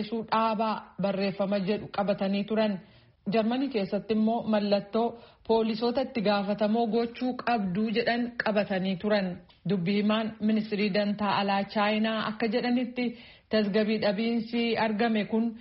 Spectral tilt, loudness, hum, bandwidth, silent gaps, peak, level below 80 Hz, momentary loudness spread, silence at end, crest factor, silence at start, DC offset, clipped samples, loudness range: -4.5 dB/octave; -28 LUFS; none; 5.8 kHz; none; -14 dBFS; -64 dBFS; 5 LU; 0 s; 14 dB; 0 s; under 0.1%; under 0.1%; 1 LU